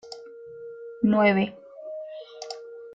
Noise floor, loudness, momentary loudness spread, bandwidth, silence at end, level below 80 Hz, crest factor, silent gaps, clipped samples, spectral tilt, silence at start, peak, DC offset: -43 dBFS; -23 LUFS; 22 LU; 7.8 kHz; 0 s; -66 dBFS; 20 dB; none; under 0.1%; -6.5 dB/octave; 0.05 s; -8 dBFS; under 0.1%